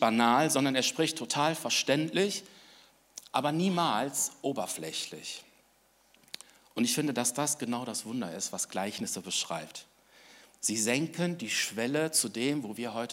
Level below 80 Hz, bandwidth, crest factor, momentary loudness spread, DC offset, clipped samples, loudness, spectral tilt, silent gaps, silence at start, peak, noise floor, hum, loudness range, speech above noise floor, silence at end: -80 dBFS; 16 kHz; 22 dB; 14 LU; under 0.1%; under 0.1%; -30 LUFS; -3 dB/octave; none; 0 s; -10 dBFS; -66 dBFS; none; 4 LU; 36 dB; 0 s